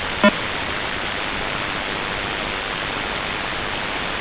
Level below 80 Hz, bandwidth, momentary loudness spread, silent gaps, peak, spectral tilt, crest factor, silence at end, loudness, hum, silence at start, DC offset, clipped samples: -40 dBFS; 4 kHz; 6 LU; none; 0 dBFS; -1.5 dB/octave; 24 dB; 0 s; -23 LUFS; none; 0 s; under 0.1%; under 0.1%